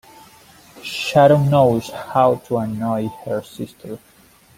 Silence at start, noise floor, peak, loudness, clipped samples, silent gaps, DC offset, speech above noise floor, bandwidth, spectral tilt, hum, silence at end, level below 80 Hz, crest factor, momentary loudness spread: 0.75 s; -47 dBFS; -2 dBFS; -18 LUFS; under 0.1%; none; under 0.1%; 29 dB; 16.5 kHz; -6.5 dB/octave; none; 0.6 s; -54 dBFS; 18 dB; 20 LU